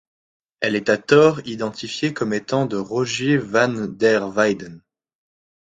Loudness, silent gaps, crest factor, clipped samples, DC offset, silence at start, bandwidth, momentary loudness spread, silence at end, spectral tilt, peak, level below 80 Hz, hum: -20 LUFS; none; 20 dB; under 0.1%; under 0.1%; 0.6 s; 9.2 kHz; 12 LU; 0.9 s; -5 dB/octave; -2 dBFS; -60 dBFS; none